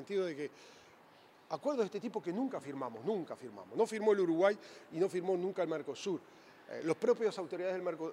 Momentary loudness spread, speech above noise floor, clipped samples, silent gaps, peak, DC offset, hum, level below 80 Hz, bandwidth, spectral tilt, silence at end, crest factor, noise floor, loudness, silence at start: 13 LU; 26 dB; under 0.1%; none; -16 dBFS; under 0.1%; none; under -90 dBFS; 12.5 kHz; -6 dB/octave; 0 s; 20 dB; -62 dBFS; -36 LUFS; 0 s